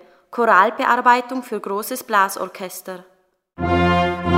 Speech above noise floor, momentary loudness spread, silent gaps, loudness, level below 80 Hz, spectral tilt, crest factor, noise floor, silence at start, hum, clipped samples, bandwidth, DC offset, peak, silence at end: 21 dB; 17 LU; none; -18 LUFS; -44 dBFS; -5 dB/octave; 20 dB; -40 dBFS; 0.3 s; none; under 0.1%; 16 kHz; under 0.1%; 0 dBFS; 0 s